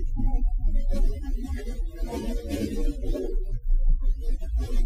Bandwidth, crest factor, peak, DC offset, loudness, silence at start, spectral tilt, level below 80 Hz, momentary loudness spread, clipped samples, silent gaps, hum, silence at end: 9.2 kHz; 12 dB; -12 dBFS; under 0.1%; -31 LUFS; 0 s; -7 dB/octave; -24 dBFS; 5 LU; under 0.1%; none; none; 0 s